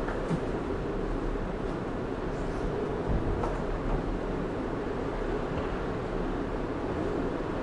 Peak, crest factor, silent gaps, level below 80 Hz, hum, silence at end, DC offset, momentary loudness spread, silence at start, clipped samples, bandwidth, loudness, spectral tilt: -16 dBFS; 14 dB; none; -38 dBFS; none; 0 s; under 0.1%; 3 LU; 0 s; under 0.1%; 10.5 kHz; -33 LUFS; -7.5 dB/octave